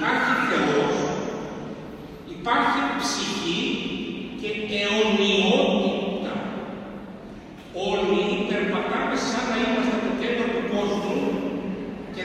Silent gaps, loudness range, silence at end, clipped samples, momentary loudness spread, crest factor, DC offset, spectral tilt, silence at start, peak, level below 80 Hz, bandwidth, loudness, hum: none; 3 LU; 0 s; under 0.1%; 16 LU; 16 dB; under 0.1%; -4.5 dB/octave; 0 s; -8 dBFS; -52 dBFS; 13 kHz; -24 LUFS; none